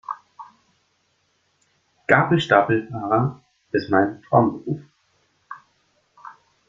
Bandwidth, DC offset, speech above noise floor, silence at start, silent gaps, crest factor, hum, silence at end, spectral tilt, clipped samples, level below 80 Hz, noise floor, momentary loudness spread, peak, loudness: 7.6 kHz; under 0.1%; 48 dB; 0.1 s; none; 24 dB; none; 0.4 s; -7.5 dB/octave; under 0.1%; -60 dBFS; -67 dBFS; 22 LU; 0 dBFS; -20 LUFS